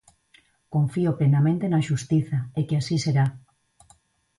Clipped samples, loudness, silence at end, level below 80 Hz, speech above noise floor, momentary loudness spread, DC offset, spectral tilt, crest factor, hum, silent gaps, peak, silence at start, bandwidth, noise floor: under 0.1%; -24 LUFS; 1 s; -58 dBFS; 38 dB; 6 LU; under 0.1%; -7 dB/octave; 12 dB; none; none; -12 dBFS; 0.7 s; 11.5 kHz; -60 dBFS